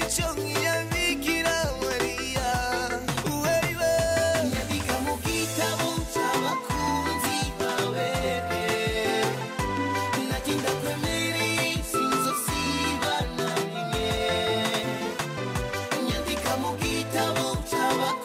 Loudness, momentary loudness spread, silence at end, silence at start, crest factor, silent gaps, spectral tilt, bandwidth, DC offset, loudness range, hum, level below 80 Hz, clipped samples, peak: -26 LUFS; 4 LU; 0 s; 0 s; 14 dB; none; -3.5 dB/octave; 16 kHz; under 0.1%; 2 LU; none; -42 dBFS; under 0.1%; -12 dBFS